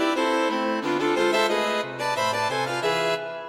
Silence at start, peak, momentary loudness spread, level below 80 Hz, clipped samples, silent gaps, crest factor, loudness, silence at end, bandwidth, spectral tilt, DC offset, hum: 0 s; -10 dBFS; 5 LU; -64 dBFS; under 0.1%; none; 14 dB; -24 LUFS; 0 s; 16 kHz; -3.5 dB/octave; under 0.1%; none